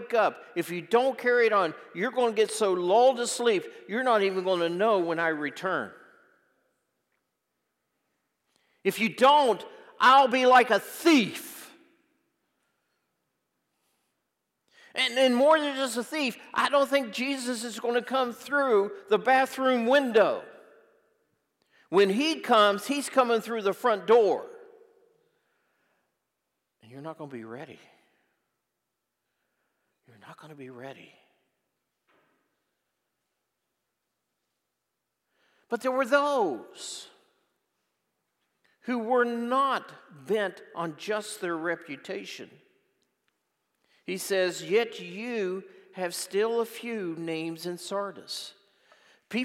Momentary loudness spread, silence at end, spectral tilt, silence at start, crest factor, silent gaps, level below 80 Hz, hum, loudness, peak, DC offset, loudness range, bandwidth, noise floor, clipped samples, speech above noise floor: 17 LU; 0 s; -3.5 dB/octave; 0 s; 22 dB; none; -90 dBFS; none; -26 LUFS; -8 dBFS; under 0.1%; 15 LU; 16 kHz; -83 dBFS; under 0.1%; 57 dB